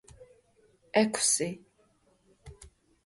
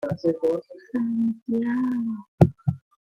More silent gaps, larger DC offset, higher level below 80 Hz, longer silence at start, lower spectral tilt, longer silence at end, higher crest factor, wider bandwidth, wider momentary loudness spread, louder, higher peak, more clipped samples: second, none vs 1.42-1.46 s, 2.28-2.38 s; neither; second, -62 dBFS vs -54 dBFS; first, 0.2 s vs 0 s; second, -2.5 dB/octave vs -10 dB/octave; first, 0.4 s vs 0.25 s; about the same, 22 dB vs 22 dB; first, 12 kHz vs 7.2 kHz; first, 22 LU vs 10 LU; about the same, -27 LUFS vs -25 LUFS; second, -12 dBFS vs -2 dBFS; neither